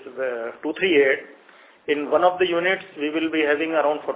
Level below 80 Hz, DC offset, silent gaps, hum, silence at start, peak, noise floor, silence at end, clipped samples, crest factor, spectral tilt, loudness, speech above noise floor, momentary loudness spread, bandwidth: -66 dBFS; under 0.1%; none; none; 0 s; -4 dBFS; -51 dBFS; 0 s; under 0.1%; 18 dB; -8 dB/octave; -22 LUFS; 30 dB; 10 LU; 4 kHz